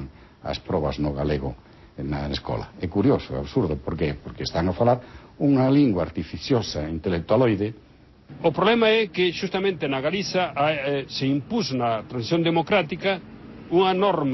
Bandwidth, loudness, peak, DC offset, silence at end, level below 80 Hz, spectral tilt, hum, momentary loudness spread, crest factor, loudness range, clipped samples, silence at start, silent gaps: 6.2 kHz; -24 LUFS; -8 dBFS; under 0.1%; 0 s; -42 dBFS; -6.5 dB/octave; none; 11 LU; 16 dB; 4 LU; under 0.1%; 0 s; none